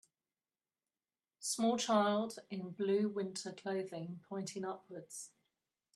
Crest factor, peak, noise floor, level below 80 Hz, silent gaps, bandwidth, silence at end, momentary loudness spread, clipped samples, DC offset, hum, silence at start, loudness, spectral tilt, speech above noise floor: 20 dB; -20 dBFS; under -90 dBFS; -84 dBFS; none; 13 kHz; 0.7 s; 17 LU; under 0.1%; under 0.1%; none; 1.4 s; -38 LUFS; -4.5 dB/octave; over 52 dB